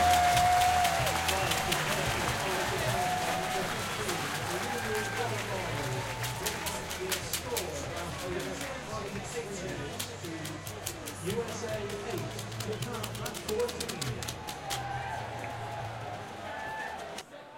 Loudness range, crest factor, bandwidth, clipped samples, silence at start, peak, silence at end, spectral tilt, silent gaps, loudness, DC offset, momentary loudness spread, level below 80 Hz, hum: 8 LU; 22 dB; 17 kHz; under 0.1%; 0 s; -10 dBFS; 0 s; -3 dB/octave; none; -32 LUFS; under 0.1%; 10 LU; -52 dBFS; none